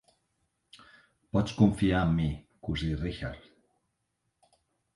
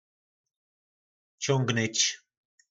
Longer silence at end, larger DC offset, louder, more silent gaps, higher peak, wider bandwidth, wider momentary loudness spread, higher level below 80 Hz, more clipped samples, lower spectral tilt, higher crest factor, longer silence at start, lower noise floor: first, 1.55 s vs 0.55 s; neither; about the same, -29 LUFS vs -27 LUFS; neither; about the same, -10 dBFS vs -12 dBFS; first, 11.5 kHz vs 8.2 kHz; first, 15 LU vs 10 LU; first, -46 dBFS vs -80 dBFS; neither; first, -7.5 dB/octave vs -3 dB/octave; about the same, 22 dB vs 22 dB; about the same, 1.35 s vs 1.4 s; second, -80 dBFS vs under -90 dBFS